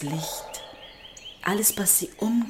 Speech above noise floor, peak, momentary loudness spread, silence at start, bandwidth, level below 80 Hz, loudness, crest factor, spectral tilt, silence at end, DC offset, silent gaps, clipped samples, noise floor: 20 dB; -6 dBFS; 22 LU; 0 s; 17 kHz; -58 dBFS; -23 LUFS; 20 dB; -3 dB/octave; 0 s; under 0.1%; none; under 0.1%; -45 dBFS